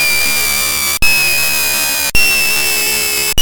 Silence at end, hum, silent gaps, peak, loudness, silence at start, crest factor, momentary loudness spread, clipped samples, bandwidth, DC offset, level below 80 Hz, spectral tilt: 0 s; none; none; 0 dBFS; -11 LUFS; 0 s; 12 dB; 2 LU; under 0.1%; 20 kHz; under 0.1%; -30 dBFS; 0 dB/octave